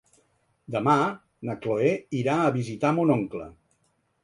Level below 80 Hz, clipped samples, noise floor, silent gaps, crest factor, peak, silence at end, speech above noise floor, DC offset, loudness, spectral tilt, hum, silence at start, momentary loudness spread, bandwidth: -64 dBFS; under 0.1%; -70 dBFS; none; 20 dB; -6 dBFS; 0.75 s; 46 dB; under 0.1%; -25 LUFS; -7.5 dB/octave; none; 0.7 s; 13 LU; 11 kHz